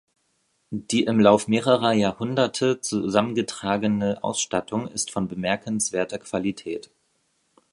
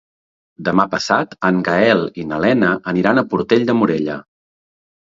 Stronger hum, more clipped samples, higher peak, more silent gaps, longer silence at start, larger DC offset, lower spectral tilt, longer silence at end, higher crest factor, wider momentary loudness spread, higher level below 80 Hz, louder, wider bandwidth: neither; neither; about the same, -2 dBFS vs 0 dBFS; neither; about the same, 0.7 s vs 0.6 s; neither; second, -4.5 dB/octave vs -6 dB/octave; about the same, 0.9 s vs 0.85 s; about the same, 22 dB vs 18 dB; about the same, 10 LU vs 8 LU; second, -58 dBFS vs -52 dBFS; second, -23 LUFS vs -17 LUFS; first, 11.5 kHz vs 7.8 kHz